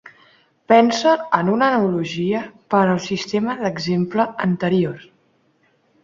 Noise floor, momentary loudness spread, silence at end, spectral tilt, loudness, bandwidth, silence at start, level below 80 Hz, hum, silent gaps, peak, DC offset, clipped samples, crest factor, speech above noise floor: -61 dBFS; 8 LU; 1.05 s; -6 dB/octave; -19 LUFS; 7.6 kHz; 0.7 s; -60 dBFS; none; none; -2 dBFS; under 0.1%; under 0.1%; 18 dB; 43 dB